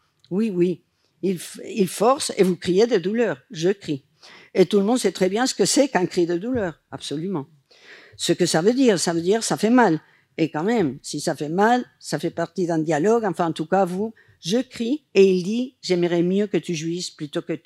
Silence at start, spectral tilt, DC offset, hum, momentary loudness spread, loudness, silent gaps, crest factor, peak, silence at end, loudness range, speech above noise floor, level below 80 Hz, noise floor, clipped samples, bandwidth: 0.3 s; -5 dB/octave; under 0.1%; none; 11 LU; -22 LUFS; none; 18 dB; -4 dBFS; 0.1 s; 2 LU; 27 dB; -66 dBFS; -48 dBFS; under 0.1%; 15.5 kHz